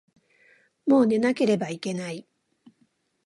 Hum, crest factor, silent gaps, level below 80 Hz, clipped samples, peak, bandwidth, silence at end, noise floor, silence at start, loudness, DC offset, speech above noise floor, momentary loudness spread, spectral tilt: none; 18 dB; none; -74 dBFS; under 0.1%; -10 dBFS; 11.5 kHz; 1.05 s; -68 dBFS; 0.85 s; -24 LUFS; under 0.1%; 45 dB; 14 LU; -6 dB/octave